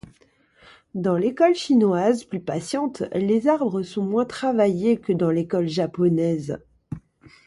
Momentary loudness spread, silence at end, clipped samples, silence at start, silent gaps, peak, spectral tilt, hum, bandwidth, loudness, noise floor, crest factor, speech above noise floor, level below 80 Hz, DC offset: 13 LU; 0.5 s; under 0.1%; 0.95 s; none; -6 dBFS; -7 dB/octave; none; 11.5 kHz; -22 LUFS; -59 dBFS; 18 dB; 38 dB; -60 dBFS; under 0.1%